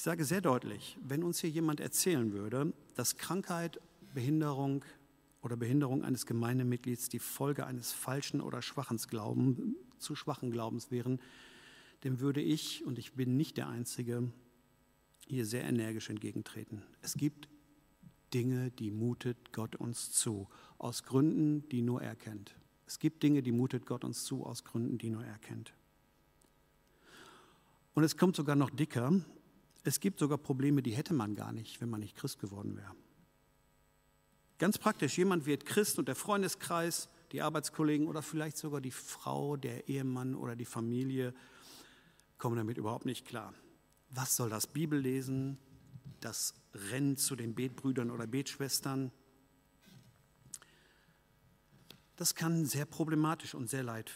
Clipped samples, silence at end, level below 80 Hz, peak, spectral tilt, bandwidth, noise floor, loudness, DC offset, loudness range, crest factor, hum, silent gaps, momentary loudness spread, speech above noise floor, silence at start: under 0.1%; 0 s; -76 dBFS; -14 dBFS; -5 dB/octave; 16 kHz; -71 dBFS; -36 LUFS; under 0.1%; 6 LU; 22 dB; none; none; 13 LU; 35 dB; 0 s